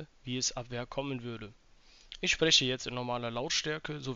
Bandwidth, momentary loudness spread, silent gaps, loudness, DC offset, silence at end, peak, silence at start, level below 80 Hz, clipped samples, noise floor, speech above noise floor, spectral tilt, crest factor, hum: 8 kHz; 17 LU; none; -31 LUFS; under 0.1%; 0 s; -12 dBFS; 0 s; -56 dBFS; under 0.1%; -55 dBFS; 21 dB; -2 dB/octave; 22 dB; none